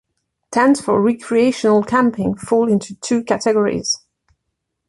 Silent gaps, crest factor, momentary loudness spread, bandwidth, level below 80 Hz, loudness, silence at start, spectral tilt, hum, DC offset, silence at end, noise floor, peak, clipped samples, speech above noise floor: none; 16 dB; 7 LU; 11.5 kHz; -54 dBFS; -17 LUFS; 0.5 s; -5 dB/octave; none; under 0.1%; 0.9 s; -75 dBFS; -2 dBFS; under 0.1%; 59 dB